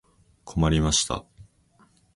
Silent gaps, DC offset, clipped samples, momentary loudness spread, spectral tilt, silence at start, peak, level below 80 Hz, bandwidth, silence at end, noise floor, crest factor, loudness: none; under 0.1%; under 0.1%; 13 LU; -4 dB/octave; 0.45 s; -8 dBFS; -36 dBFS; 11.5 kHz; 0.75 s; -61 dBFS; 20 dB; -24 LUFS